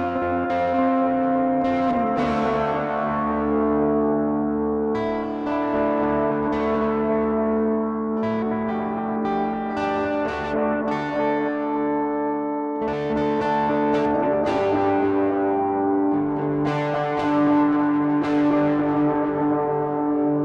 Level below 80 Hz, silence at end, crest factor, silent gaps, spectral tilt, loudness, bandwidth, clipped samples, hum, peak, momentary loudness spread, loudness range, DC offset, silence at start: -48 dBFS; 0 s; 10 dB; none; -8 dB/octave; -22 LUFS; 6.8 kHz; under 0.1%; none; -10 dBFS; 4 LU; 3 LU; under 0.1%; 0 s